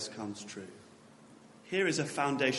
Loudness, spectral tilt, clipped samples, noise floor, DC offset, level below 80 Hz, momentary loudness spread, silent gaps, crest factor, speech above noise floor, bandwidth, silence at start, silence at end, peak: -34 LUFS; -4 dB/octave; under 0.1%; -57 dBFS; under 0.1%; -78 dBFS; 22 LU; none; 20 dB; 24 dB; 11.5 kHz; 0 s; 0 s; -16 dBFS